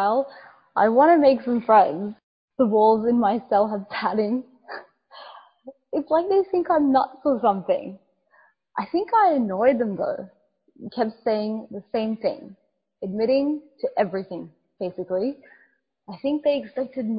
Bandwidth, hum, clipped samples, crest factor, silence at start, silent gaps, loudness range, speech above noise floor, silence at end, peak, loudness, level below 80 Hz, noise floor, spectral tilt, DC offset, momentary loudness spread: 5.2 kHz; none; under 0.1%; 18 dB; 0 s; 2.23-2.48 s; 8 LU; 41 dB; 0 s; -4 dBFS; -22 LUFS; -66 dBFS; -63 dBFS; -10.5 dB/octave; under 0.1%; 19 LU